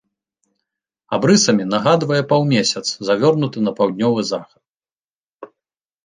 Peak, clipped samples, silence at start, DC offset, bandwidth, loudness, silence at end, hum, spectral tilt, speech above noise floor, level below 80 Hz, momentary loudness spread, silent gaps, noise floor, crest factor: -2 dBFS; under 0.1%; 1.1 s; under 0.1%; 9.8 kHz; -17 LUFS; 0.6 s; none; -4.5 dB/octave; over 74 dB; -62 dBFS; 8 LU; 4.69-4.74 s, 4.92-5.25 s, 5.32-5.39 s; under -90 dBFS; 18 dB